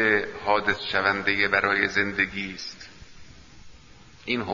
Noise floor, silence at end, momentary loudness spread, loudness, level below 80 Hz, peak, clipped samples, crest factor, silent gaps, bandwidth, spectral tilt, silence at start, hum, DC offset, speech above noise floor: -51 dBFS; 0 s; 16 LU; -24 LUFS; -54 dBFS; -4 dBFS; under 0.1%; 22 dB; none; 7.4 kHz; -4 dB/octave; 0 s; none; 0.2%; 26 dB